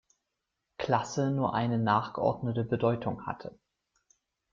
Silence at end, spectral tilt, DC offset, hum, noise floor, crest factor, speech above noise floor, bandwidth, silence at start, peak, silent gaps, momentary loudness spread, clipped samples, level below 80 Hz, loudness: 1 s; -6.5 dB/octave; under 0.1%; none; -85 dBFS; 20 dB; 55 dB; 7.6 kHz; 0.8 s; -12 dBFS; none; 11 LU; under 0.1%; -64 dBFS; -30 LUFS